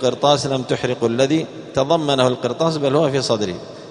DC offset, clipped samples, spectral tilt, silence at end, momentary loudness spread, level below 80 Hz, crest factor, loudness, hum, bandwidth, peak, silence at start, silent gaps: under 0.1%; under 0.1%; -5 dB/octave; 0 s; 6 LU; -54 dBFS; 18 dB; -19 LUFS; none; 10.5 kHz; 0 dBFS; 0 s; none